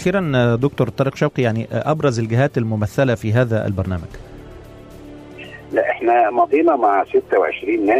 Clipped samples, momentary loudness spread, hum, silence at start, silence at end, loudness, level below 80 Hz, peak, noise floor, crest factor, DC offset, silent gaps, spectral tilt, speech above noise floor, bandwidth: under 0.1%; 21 LU; none; 0 s; 0 s; -18 LUFS; -46 dBFS; -6 dBFS; -38 dBFS; 12 dB; under 0.1%; none; -7.5 dB/octave; 21 dB; 14 kHz